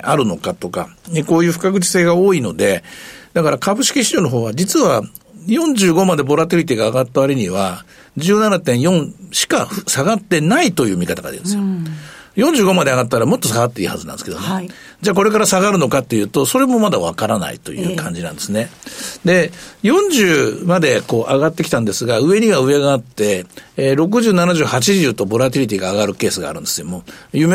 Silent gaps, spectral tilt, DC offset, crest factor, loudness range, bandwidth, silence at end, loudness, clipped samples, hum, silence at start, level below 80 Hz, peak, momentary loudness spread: none; -4.5 dB/octave; under 0.1%; 14 dB; 2 LU; 16 kHz; 0 s; -15 LUFS; under 0.1%; none; 0 s; -52 dBFS; -2 dBFS; 11 LU